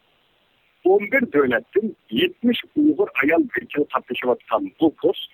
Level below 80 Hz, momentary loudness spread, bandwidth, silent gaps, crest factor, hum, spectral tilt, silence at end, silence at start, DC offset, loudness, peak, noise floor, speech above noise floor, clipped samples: -62 dBFS; 6 LU; 15 kHz; none; 16 dB; none; -7.5 dB/octave; 0.1 s; 0.85 s; under 0.1%; -21 LUFS; -4 dBFS; -62 dBFS; 42 dB; under 0.1%